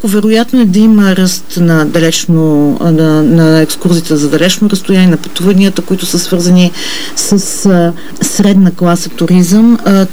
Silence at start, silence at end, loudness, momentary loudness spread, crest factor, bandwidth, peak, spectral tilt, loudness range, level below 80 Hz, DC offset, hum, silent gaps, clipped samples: 0.05 s; 0 s; -8 LUFS; 6 LU; 8 dB; over 20 kHz; 0 dBFS; -5.5 dB/octave; 2 LU; -44 dBFS; 10%; none; none; 0.2%